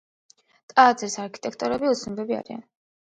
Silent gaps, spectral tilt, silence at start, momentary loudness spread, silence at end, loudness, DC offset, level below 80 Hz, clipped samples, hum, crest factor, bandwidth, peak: none; -3.5 dB/octave; 0.75 s; 15 LU; 0.5 s; -23 LUFS; under 0.1%; -66 dBFS; under 0.1%; none; 24 dB; 9.2 kHz; -2 dBFS